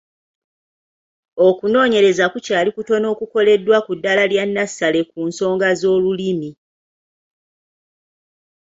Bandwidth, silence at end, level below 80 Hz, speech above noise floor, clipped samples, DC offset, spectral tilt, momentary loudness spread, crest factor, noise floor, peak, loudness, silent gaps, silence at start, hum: 8 kHz; 2.1 s; -62 dBFS; over 74 dB; under 0.1%; under 0.1%; -4.5 dB/octave; 8 LU; 16 dB; under -90 dBFS; -2 dBFS; -17 LUFS; none; 1.35 s; none